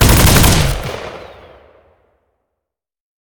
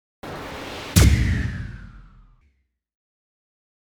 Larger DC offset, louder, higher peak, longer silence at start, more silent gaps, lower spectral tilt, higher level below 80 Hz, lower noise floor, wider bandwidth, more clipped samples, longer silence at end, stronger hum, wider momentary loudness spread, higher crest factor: neither; first, -11 LUFS vs -21 LUFS; about the same, 0 dBFS vs 0 dBFS; second, 0 s vs 0.25 s; neither; about the same, -4 dB/octave vs -5 dB/octave; first, -22 dBFS vs -28 dBFS; first, -80 dBFS vs -66 dBFS; about the same, over 20 kHz vs over 20 kHz; first, 0.1% vs under 0.1%; first, 2.05 s vs 1.9 s; neither; about the same, 22 LU vs 20 LU; second, 16 dB vs 24 dB